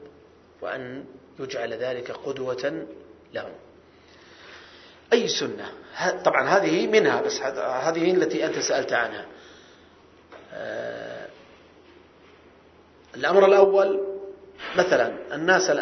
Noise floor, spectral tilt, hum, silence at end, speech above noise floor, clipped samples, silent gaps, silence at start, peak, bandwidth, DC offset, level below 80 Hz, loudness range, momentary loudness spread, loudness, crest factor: -53 dBFS; -3.5 dB/octave; none; 0 s; 30 dB; under 0.1%; none; 0 s; -2 dBFS; 6.4 kHz; under 0.1%; -66 dBFS; 13 LU; 21 LU; -23 LUFS; 24 dB